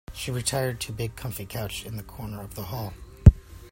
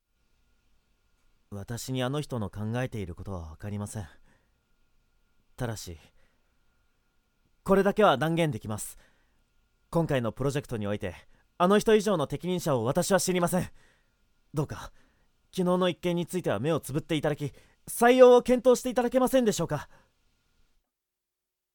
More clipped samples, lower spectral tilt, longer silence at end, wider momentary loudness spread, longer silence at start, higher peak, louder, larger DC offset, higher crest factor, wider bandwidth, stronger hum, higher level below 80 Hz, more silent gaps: neither; about the same, -5.5 dB/octave vs -5.5 dB/octave; second, 0.05 s vs 1.9 s; first, 19 LU vs 16 LU; second, 0.1 s vs 1.5 s; first, 0 dBFS vs -6 dBFS; about the same, -26 LUFS vs -27 LUFS; neither; about the same, 24 dB vs 24 dB; second, 16.5 kHz vs 19 kHz; neither; first, -30 dBFS vs -54 dBFS; neither